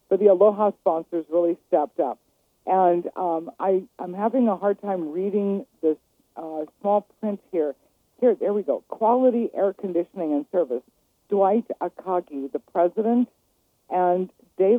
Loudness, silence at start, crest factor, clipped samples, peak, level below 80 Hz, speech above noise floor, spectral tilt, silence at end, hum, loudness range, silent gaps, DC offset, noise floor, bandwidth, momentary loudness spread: -24 LUFS; 0.1 s; 18 dB; under 0.1%; -4 dBFS; -76 dBFS; 45 dB; -9.5 dB/octave; 0 s; none; 3 LU; none; under 0.1%; -68 dBFS; 3.8 kHz; 11 LU